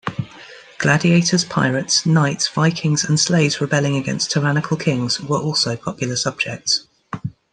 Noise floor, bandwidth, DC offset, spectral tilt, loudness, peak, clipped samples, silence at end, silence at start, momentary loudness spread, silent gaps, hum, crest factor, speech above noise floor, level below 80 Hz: -41 dBFS; 10.5 kHz; under 0.1%; -4 dB/octave; -18 LUFS; -2 dBFS; under 0.1%; 0.2 s; 0.05 s; 10 LU; none; none; 16 dB; 23 dB; -56 dBFS